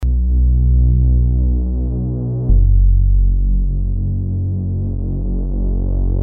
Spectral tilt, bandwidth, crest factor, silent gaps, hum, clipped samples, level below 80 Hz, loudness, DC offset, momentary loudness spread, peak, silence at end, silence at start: -15.5 dB/octave; 1.1 kHz; 10 dB; none; none; under 0.1%; -14 dBFS; -17 LUFS; under 0.1%; 7 LU; -4 dBFS; 0 s; 0 s